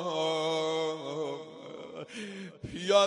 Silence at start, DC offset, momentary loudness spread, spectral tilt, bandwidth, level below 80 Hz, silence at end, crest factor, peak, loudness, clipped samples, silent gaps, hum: 0 s; under 0.1%; 14 LU; -3.5 dB/octave; 11 kHz; -66 dBFS; 0 s; 22 dB; -10 dBFS; -33 LUFS; under 0.1%; none; none